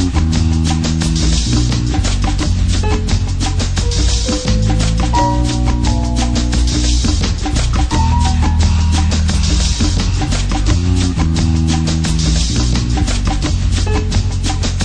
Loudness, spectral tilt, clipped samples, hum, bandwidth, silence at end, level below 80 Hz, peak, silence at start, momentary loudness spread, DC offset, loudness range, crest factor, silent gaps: -15 LUFS; -5 dB/octave; under 0.1%; none; 10.5 kHz; 0 s; -16 dBFS; -2 dBFS; 0 s; 3 LU; under 0.1%; 1 LU; 12 dB; none